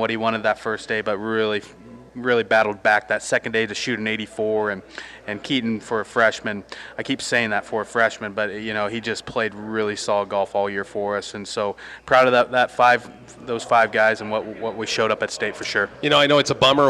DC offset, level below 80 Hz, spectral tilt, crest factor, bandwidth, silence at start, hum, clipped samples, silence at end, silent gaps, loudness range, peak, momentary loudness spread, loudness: under 0.1%; -58 dBFS; -3.5 dB/octave; 16 dB; 13 kHz; 0 s; none; under 0.1%; 0 s; none; 5 LU; -6 dBFS; 12 LU; -21 LUFS